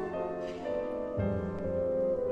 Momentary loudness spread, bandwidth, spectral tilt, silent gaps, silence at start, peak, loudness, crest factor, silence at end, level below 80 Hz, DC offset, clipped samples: 5 LU; 7.8 kHz; -9 dB/octave; none; 0 s; -20 dBFS; -33 LUFS; 14 dB; 0 s; -52 dBFS; under 0.1%; under 0.1%